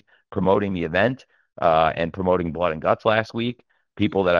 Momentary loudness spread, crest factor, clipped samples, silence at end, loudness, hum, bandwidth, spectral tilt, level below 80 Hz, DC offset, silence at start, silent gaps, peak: 8 LU; 20 dB; under 0.1%; 0 s; -22 LUFS; none; 7 kHz; -7.5 dB/octave; -50 dBFS; under 0.1%; 0.3 s; none; -2 dBFS